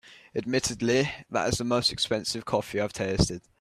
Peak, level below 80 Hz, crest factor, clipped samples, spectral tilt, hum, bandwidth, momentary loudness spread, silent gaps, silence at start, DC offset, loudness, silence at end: -8 dBFS; -48 dBFS; 20 dB; under 0.1%; -4 dB/octave; none; 14.5 kHz; 5 LU; none; 0.05 s; under 0.1%; -27 LUFS; 0.2 s